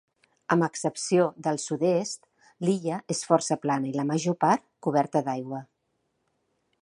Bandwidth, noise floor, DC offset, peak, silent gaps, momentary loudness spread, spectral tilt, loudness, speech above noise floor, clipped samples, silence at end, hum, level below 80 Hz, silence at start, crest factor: 11.5 kHz; -76 dBFS; under 0.1%; -6 dBFS; none; 9 LU; -5.5 dB/octave; -27 LUFS; 50 dB; under 0.1%; 1.2 s; none; -76 dBFS; 0.5 s; 22 dB